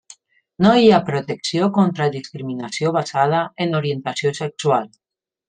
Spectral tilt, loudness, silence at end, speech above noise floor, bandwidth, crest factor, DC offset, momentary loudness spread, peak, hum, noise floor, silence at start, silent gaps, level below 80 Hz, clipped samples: -6 dB/octave; -19 LUFS; 0.6 s; 30 dB; 9.6 kHz; 18 dB; under 0.1%; 12 LU; -2 dBFS; none; -48 dBFS; 0.6 s; none; -58 dBFS; under 0.1%